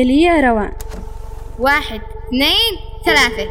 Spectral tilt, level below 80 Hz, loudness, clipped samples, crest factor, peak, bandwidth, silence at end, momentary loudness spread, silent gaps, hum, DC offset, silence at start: -3.5 dB/octave; -28 dBFS; -14 LUFS; under 0.1%; 14 dB; -2 dBFS; over 20 kHz; 0 s; 20 LU; none; none; under 0.1%; 0 s